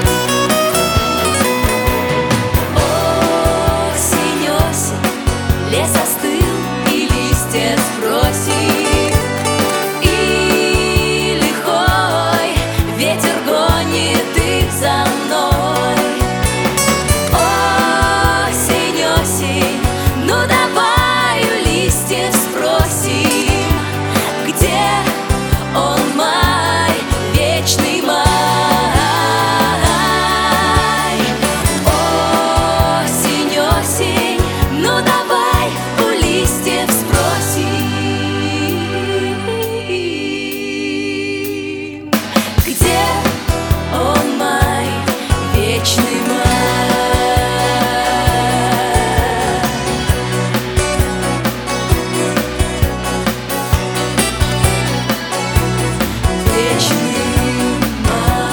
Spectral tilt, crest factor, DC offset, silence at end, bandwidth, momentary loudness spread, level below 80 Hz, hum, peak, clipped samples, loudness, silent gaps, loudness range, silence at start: -4 dB/octave; 14 dB; under 0.1%; 0 s; over 20 kHz; 5 LU; -24 dBFS; none; 0 dBFS; under 0.1%; -14 LUFS; none; 3 LU; 0 s